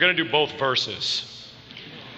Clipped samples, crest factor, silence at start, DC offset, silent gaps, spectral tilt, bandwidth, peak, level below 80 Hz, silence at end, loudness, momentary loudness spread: under 0.1%; 20 dB; 0 s; under 0.1%; none; -3 dB/octave; 8.6 kHz; -6 dBFS; -64 dBFS; 0 s; -23 LUFS; 20 LU